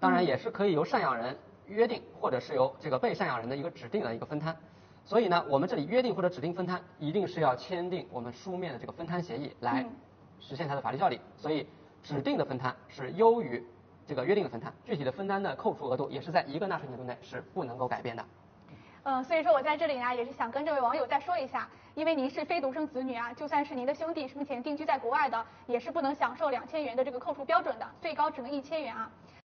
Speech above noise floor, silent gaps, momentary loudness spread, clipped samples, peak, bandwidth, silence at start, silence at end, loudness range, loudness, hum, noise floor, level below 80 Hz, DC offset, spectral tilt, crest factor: 22 dB; none; 11 LU; under 0.1%; -10 dBFS; 6.6 kHz; 0 s; 0.15 s; 4 LU; -32 LUFS; none; -54 dBFS; -72 dBFS; under 0.1%; -4.5 dB/octave; 22 dB